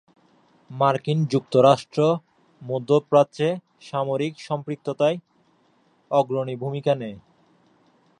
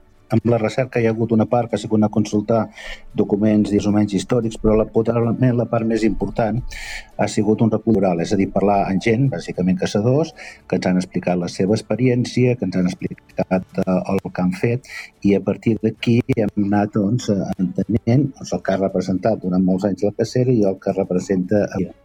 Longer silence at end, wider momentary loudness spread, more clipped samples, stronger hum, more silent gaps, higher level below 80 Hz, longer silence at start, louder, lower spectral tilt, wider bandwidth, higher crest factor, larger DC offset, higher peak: first, 1 s vs 0.15 s; first, 13 LU vs 5 LU; neither; neither; neither; second, -70 dBFS vs -42 dBFS; first, 0.7 s vs 0.3 s; second, -23 LUFS vs -19 LUFS; about the same, -7 dB/octave vs -7.5 dB/octave; about the same, 10.5 kHz vs 11 kHz; first, 20 dB vs 14 dB; neither; about the same, -4 dBFS vs -4 dBFS